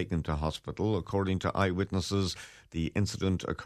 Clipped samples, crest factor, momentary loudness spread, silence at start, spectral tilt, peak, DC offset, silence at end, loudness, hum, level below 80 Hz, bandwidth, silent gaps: under 0.1%; 18 dB; 6 LU; 0 s; -6 dB/octave; -14 dBFS; under 0.1%; 0 s; -32 LUFS; none; -46 dBFS; 13.5 kHz; none